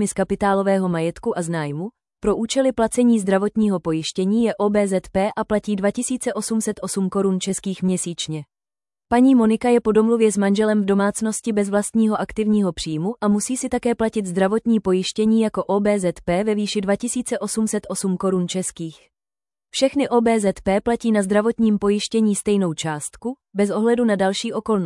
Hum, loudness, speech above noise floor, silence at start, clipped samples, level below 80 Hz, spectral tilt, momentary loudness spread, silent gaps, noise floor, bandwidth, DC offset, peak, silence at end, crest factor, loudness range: none; -20 LUFS; over 70 dB; 0 s; under 0.1%; -50 dBFS; -5.5 dB/octave; 7 LU; none; under -90 dBFS; 12 kHz; under 0.1%; -4 dBFS; 0 s; 14 dB; 4 LU